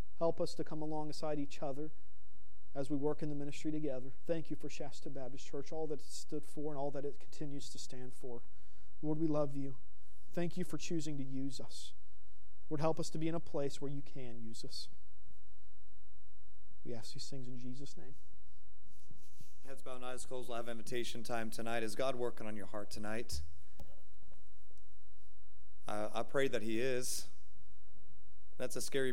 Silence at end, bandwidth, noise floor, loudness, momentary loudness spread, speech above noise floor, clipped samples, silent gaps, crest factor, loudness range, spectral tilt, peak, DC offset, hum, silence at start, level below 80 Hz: 0 s; 16 kHz; -67 dBFS; -42 LUFS; 14 LU; 25 dB; under 0.1%; none; 22 dB; 11 LU; -5 dB/octave; -18 dBFS; 3%; none; 0.2 s; -64 dBFS